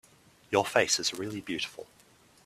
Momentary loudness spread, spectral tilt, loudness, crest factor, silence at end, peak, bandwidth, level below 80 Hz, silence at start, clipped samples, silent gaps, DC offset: 12 LU; -2 dB/octave; -29 LUFS; 24 dB; 0.6 s; -8 dBFS; 15 kHz; -68 dBFS; 0.5 s; under 0.1%; none; under 0.1%